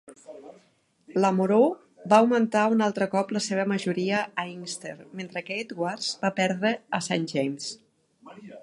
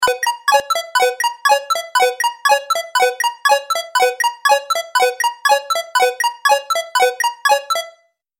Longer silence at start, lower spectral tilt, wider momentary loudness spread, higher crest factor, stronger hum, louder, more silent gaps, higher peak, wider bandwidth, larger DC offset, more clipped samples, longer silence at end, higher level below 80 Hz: about the same, 0.1 s vs 0 s; first, -5 dB/octave vs 2 dB/octave; first, 18 LU vs 3 LU; first, 22 dB vs 16 dB; neither; second, -26 LUFS vs -16 LUFS; neither; about the same, -4 dBFS vs -2 dBFS; second, 11.5 kHz vs 17 kHz; neither; neither; second, 0.05 s vs 0.5 s; second, -74 dBFS vs -68 dBFS